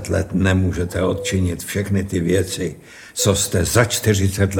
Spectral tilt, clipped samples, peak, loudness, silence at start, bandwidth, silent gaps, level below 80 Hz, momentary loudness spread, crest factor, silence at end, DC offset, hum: -5 dB/octave; under 0.1%; 0 dBFS; -19 LUFS; 0 s; 18.5 kHz; none; -40 dBFS; 7 LU; 18 dB; 0 s; under 0.1%; none